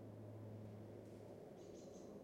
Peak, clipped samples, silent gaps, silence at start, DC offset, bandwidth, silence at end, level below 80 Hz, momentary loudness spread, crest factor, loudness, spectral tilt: -44 dBFS; under 0.1%; none; 0 s; under 0.1%; 16 kHz; 0 s; -78 dBFS; 2 LU; 12 dB; -57 LUFS; -7.5 dB/octave